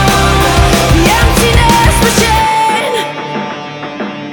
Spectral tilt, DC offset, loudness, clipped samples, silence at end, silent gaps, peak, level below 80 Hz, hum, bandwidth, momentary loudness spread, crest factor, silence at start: -4 dB/octave; under 0.1%; -9 LUFS; 0.3%; 0 s; none; 0 dBFS; -18 dBFS; none; over 20 kHz; 13 LU; 10 dB; 0 s